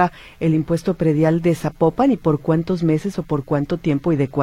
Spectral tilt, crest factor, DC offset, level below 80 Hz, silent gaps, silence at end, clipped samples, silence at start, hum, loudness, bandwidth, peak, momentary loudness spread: -8.5 dB/octave; 16 dB; under 0.1%; -44 dBFS; none; 0 s; under 0.1%; 0 s; none; -19 LUFS; 13.5 kHz; -2 dBFS; 5 LU